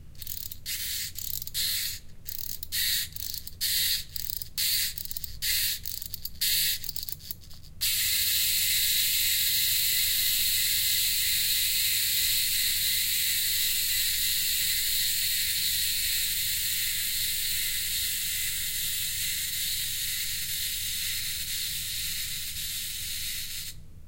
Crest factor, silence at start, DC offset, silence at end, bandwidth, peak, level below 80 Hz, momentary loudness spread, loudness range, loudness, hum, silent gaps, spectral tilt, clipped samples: 18 dB; 0 s; under 0.1%; 0 s; 17.5 kHz; -10 dBFS; -48 dBFS; 11 LU; 6 LU; -26 LUFS; none; none; 2 dB/octave; under 0.1%